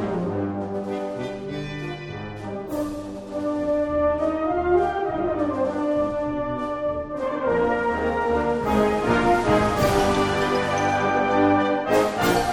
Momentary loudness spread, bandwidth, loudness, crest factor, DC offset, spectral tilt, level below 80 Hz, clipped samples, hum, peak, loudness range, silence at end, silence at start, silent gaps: 11 LU; 16 kHz; -23 LUFS; 16 dB; under 0.1%; -6 dB/octave; -42 dBFS; under 0.1%; none; -6 dBFS; 8 LU; 0 s; 0 s; none